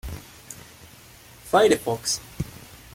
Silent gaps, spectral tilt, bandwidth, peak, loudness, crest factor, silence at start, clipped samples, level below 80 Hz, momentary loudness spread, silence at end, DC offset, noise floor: none; -3.5 dB/octave; 16.5 kHz; -6 dBFS; -23 LUFS; 22 dB; 0.05 s; under 0.1%; -48 dBFS; 25 LU; 0.2 s; under 0.1%; -48 dBFS